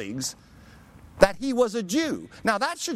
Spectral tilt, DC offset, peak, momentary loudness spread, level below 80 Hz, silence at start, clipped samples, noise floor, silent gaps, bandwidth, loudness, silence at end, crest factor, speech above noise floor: -3.5 dB/octave; under 0.1%; -2 dBFS; 10 LU; -48 dBFS; 0 s; under 0.1%; -50 dBFS; none; 16 kHz; -25 LUFS; 0 s; 24 dB; 25 dB